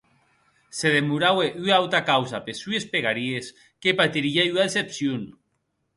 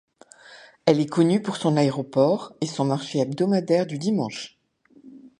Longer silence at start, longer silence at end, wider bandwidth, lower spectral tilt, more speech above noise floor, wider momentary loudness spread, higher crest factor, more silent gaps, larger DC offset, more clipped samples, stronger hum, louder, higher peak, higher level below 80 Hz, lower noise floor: first, 0.75 s vs 0.5 s; first, 0.7 s vs 0.1 s; about the same, 11.5 kHz vs 11 kHz; second, -4 dB/octave vs -6.5 dB/octave; first, 50 dB vs 34 dB; first, 12 LU vs 6 LU; about the same, 20 dB vs 20 dB; neither; neither; neither; neither; about the same, -23 LUFS vs -23 LUFS; about the same, -4 dBFS vs -4 dBFS; about the same, -66 dBFS vs -70 dBFS; first, -74 dBFS vs -56 dBFS